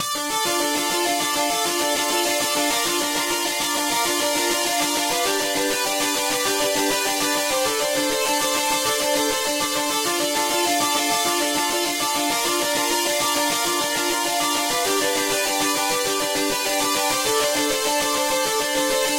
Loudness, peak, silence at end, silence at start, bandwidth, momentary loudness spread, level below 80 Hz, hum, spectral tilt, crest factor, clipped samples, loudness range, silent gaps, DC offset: -20 LUFS; -8 dBFS; 0 s; 0 s; 16 kHz; 1 LU; -56 dBFS; none; -0.5 dB/octave; 14 dB; under 0.1%; 0 LU; none; under 0.1%